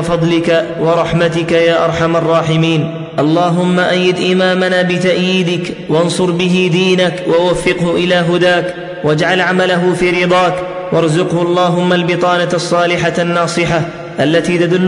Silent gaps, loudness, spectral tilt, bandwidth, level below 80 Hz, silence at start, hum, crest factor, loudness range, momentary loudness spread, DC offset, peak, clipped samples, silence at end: none; -12 LUFS; -5.5 dB/octave; 11 kHz; -44 dBFS; 0 s; none; 10 dB; 1 LU; 4 LU; under 0.1%; -2 dBFS; under 0.1%; 0 s